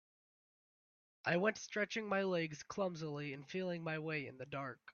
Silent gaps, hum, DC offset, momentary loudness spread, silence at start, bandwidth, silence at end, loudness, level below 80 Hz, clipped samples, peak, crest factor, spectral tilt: none; none; under 0.1%; 9 LU; 1.25 s; 7 kHz; 0 s; -40 LUFS; -80 dBFS; under 0.1%; -20 dBFS; 22 dB; -4 dB/octave